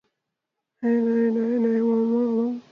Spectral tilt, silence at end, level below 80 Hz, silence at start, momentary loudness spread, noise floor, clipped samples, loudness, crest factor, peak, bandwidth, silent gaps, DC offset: -9.5 dB/octave; 0.1 s; -78 dBFS; 0.8 s; 3 LU; -83 dBFS; under 0.1%; -23 LUFS; 10 dB; -12 dBFS; 3.9 kHz; none; under 0.1%